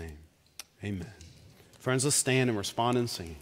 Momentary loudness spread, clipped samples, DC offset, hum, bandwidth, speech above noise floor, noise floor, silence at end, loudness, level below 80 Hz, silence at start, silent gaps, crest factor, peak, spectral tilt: 22 LU; under 0.1%; under 0.1%; none; 16 kHz; 26 dB; -56 dBFS; 0 s; -29 LUFS; -56 dBFS; 0 s; none; 20 dB; -12 dBFS; -4 dB/octave